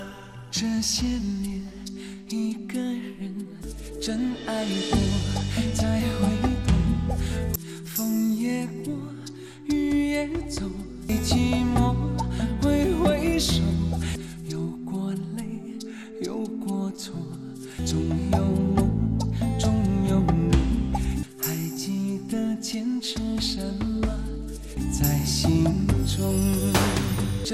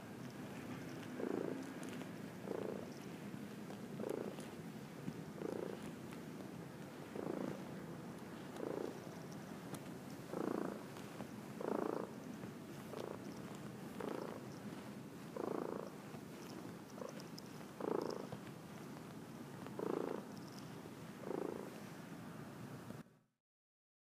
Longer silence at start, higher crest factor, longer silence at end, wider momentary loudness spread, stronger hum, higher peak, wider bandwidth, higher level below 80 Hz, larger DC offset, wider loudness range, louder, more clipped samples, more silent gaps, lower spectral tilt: about the same, 0 s vs 0 s; second, 18 dB vs 24 dB; second, 0 s vs 0.85 s; first, 12 LU vs 9 LU; neither; first, -6 dBFS vs -24 dBFS; about the same, 15 kHz vs 15.5 kHz; first, -34 dBFS vs -78 dBFS; first, 0.1% vs under 0.1%; first, 7 LU vs 3 LU; first, -26 LUFS vs -48 LUFS; neither; neither; about the same, -5.5 dB/octave vs -6 dB/octave